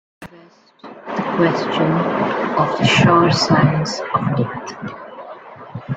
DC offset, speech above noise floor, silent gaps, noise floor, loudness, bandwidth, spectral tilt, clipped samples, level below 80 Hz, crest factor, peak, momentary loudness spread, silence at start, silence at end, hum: under 0.1%; 31 dB; none; -47 dBFS; -17 LUFS; 9.2 kHz; -5.5 dB/octave; under 0.1%; -50 dBFS; 18 dB; 0 dBFS; 22 LU; 0.2 s; 0 s; none